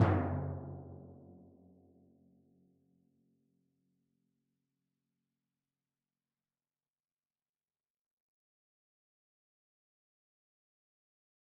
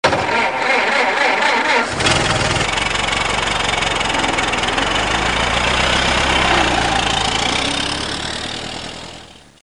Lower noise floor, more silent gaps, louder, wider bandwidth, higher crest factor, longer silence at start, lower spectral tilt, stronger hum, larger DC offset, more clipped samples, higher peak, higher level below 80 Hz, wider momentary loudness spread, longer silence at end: first, under -90 dBFS vs -39 dBFS; neither; second, -37 LUFS vs -16 LUFS; second, 2.5 kHz vs 11 kHz; first, 28 dB vs 18 dB; about the same, 0 s vs 0.05 s; first, -7 dB/octave vs -2.5 dB/octave; neither; second, under 0.1% vs 0.4%; neither; second, -16 dBFS vs 0 dBFS; second, -68 dBFS vs -32 dBFS; first, 25 LU vs 8 LU; first, 10.15 s vs 0.3 s